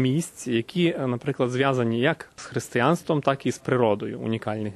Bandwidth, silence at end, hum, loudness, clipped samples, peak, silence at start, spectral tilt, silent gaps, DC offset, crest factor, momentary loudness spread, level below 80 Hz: 13 kHz; 0 s; none; -25 LUFS; under 0.1%; -6 dBFS; 0 s; -6 dB/octave; none; under 0.1%; 18 dB; 6 LU; -64 dBFS